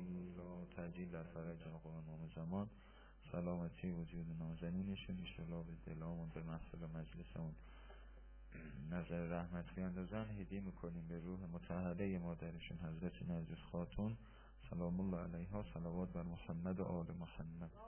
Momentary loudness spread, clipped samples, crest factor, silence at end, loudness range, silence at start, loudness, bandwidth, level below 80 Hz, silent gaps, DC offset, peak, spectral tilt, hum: 9 LU; under 0.1%; 16 dB; 0 s; 4 LU; 0 s; -48 LUFS; 3.2 kHz; -58 dBFS; none; under 0.1%; -32 dBFS; -7.5 dB/octave; none